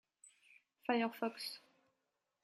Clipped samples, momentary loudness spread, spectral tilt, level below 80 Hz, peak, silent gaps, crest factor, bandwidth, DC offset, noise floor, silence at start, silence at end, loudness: under 0.1%; 10 LU; -4 dB/octave; under -90 dBFS; -20 dBFS; none; 24 dB; 15 kHz; under 0.1%; -87 dBFS; 0.9 s; 0.85 s; -40 LUFS